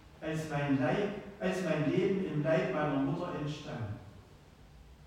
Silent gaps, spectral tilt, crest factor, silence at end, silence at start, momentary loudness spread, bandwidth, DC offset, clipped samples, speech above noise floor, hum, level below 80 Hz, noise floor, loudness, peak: none; -7 dB/octave; 16 dB; 0 s; 0 s; 10 LU; 14.5 kHz; under 0.1%; under 0.1%; 24 dB; none; -60 dBFS; -56 dBFS; -33 LUFS; -16 dBFS